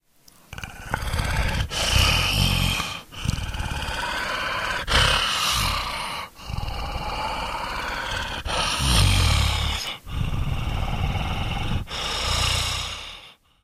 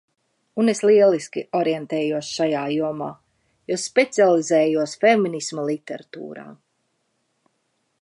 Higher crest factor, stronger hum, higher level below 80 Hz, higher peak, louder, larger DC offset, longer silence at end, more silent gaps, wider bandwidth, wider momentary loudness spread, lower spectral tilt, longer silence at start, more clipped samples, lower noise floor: about the same, 20 dB vs 18 dB; neither; first, -30 dBFS vs -72 dBFS; about the same, -4 dBFS vs -4 dBFS; second, -24 LUFS vs -20 LUFS; neither; second, 0.3 s vs 1.45 s; neither; first, 15.5 kHz vs 11.5 kHz; second, 12 LU vs 17 LU; second, -3 dB/octave vs -4.5 dB/octave; about the same, 0.5 s vs 0.55 s; neither; second, -54 dBFS vs -71 dBFS